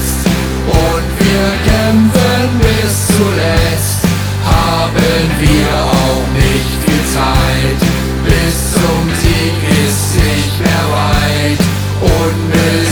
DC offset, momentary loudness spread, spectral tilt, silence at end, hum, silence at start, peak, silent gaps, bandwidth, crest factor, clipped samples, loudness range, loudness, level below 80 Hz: under 0.1%; 3 LU; -5 dB/octave; 0 s; none; 0 s; 0 dBFS; none; over 20 kHz; 10 dB; under 0.1%; 1 LU; -11 LUFS; -20 dBFS